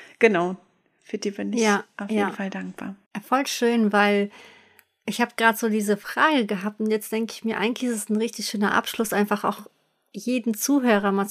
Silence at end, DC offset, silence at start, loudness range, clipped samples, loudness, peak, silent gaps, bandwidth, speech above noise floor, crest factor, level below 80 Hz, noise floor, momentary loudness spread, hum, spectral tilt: 0 s; under 0.1%; 0 s; 3 LU; under 0.1%; -23 LUFS; -2 dBFS; 3.06-3.11 s; 15.5 kHz; 33 dB; 22 dB; -70 dBFS; -57 dBFS; 13 LU; none; -4 dB/octave